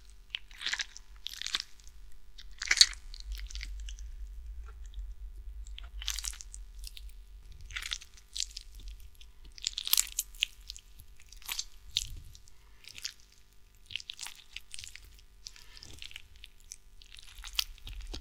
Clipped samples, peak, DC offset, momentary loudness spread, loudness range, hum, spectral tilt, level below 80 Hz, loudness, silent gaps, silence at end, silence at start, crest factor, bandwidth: under 0.1%; 0 dBFS; under 0.1%; 21 LU; 14 LU; none; 1 dB/octave; -48 dBFS; -34 LUFS; none; 0 s; 0 s; 38 dB; 18 kHz